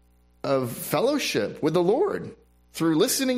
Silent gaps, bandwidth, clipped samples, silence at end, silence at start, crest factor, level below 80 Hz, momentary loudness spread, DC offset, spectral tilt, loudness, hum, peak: none; 16 kHz; under 0.1%; 0 s; 0.45 s; 18 dB; -60 dBFS; 12 LU; under 0.1%; -4.5 dB/octave; -25 LUFS; none; -8 dBFS